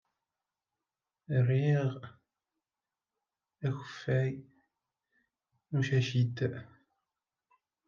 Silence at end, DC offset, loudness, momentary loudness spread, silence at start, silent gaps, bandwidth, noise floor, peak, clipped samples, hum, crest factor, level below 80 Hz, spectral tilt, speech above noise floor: 1.25 s; under 0.1%; -32 LUFS; 16 LU; 1.3 s; none; 7.2 kHz; under -90 dBFS; -18 dBFS; under 0.1%; none; 16 dB; -76 dBFS; -7.5 dB/octave; over 60 dB